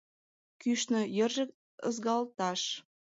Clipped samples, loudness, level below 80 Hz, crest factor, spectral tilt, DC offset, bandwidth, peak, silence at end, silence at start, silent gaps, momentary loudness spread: under 0.1%; -33 LUFS; -84 dBFS; 16 dB; -3.5 dB/octave; under 0.1%; 8 kHz; -18 dBFS; 0.35 s; 0.6 s; 1.54-1.78 s; 8 LU